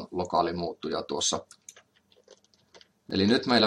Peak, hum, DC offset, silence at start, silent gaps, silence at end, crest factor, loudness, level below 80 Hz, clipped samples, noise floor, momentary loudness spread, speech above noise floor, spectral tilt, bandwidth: -10 dBFS; none; under 0.1%; 0 s; none; 0 s; 20 dB; -28 LUFS; -68 dBFS; under 0.1%; -63 dBFS; 11 LU; 37 dB; -3.5 dB/octave; 12 kHz